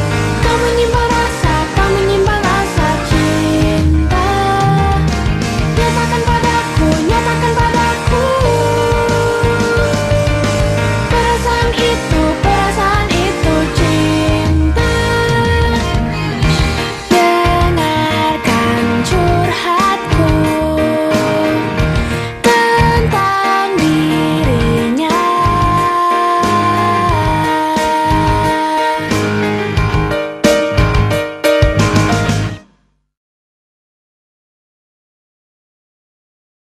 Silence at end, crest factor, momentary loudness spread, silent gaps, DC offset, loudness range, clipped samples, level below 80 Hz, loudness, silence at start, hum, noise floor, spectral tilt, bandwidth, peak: 4 s; 12 dB; 3 LU; none; under 0.1%; 1 LU; under 0.1%; -22 dBFS; -13 LUFS; 0 s; none; -56 dBFS; -5.5 dB/octave; 14.5 kHz; 0 dBFS